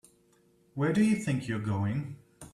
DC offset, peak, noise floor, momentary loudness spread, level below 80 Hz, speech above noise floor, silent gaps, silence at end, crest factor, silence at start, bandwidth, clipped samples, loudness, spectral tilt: under 0.1%; -14 dBFS; -65 dBFS; 18 LU; -64 dBFS; 37 dB; none; 0.05 s; 16 dB; 0.75 s; 12.5 kHz; under 0.1%; -30 LUFS; -7 dB/octave